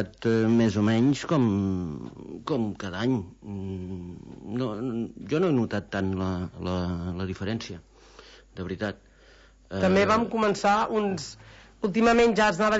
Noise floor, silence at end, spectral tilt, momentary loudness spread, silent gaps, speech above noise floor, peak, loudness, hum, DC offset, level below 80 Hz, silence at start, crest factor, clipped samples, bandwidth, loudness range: -54 dBFS; 0 s; -6.5 dB/octave; 17 LU; none; 29 dB; -12 dBFS; -26 LUFS; none; under 0.1%; -52 dBFS; 0 s; 14 dB; under 0.1%; 8 kHz; 7 LU